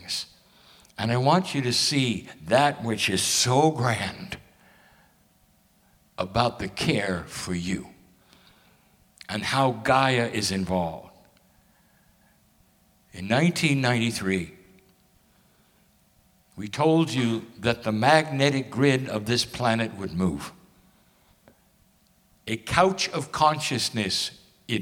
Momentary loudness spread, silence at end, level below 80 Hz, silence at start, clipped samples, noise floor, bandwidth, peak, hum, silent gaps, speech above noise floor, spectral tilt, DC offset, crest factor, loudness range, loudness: 13 LU; 0 s; -56 dBFS; 0 s; under 0.1%; -62 dBFS; 17 kHz; -2 dBFS; none; none; 38 dB; -4.5 dB/octave; under 0.1%; 24 dB; 7 LU; -24 LUFS